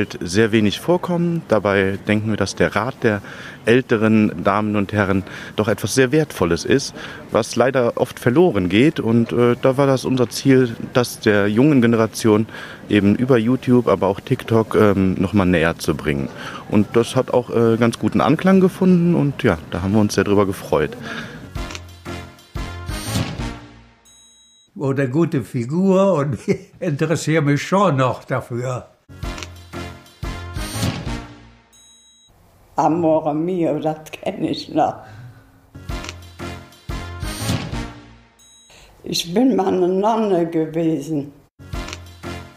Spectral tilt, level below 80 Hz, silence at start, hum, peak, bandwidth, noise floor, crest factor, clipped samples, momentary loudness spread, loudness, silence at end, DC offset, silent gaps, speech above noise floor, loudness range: -6 dB/octave; -42 dBFS; 0 s; none; 0 dBFS; 15.5 kHz; -52 dBFS; 18 dB; under 0.1%; 16 LU; -18 LUFS; 0.1 s; under 0.1%; 41.51-41.58 s; 34 dB; 11 LU